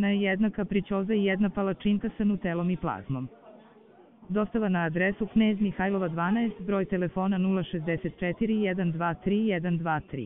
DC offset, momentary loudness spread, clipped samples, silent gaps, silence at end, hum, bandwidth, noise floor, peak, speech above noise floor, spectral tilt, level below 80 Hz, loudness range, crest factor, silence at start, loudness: under 0.1%; 5 LU; under 0.1%; none; 0 s; none; 3.8 kHz; -55 dBFS; -14 dBFS; 28 dB; -6 dB/octave; -52 dBFS; 3 LU; 14 dB; 0 s; -28 LUFS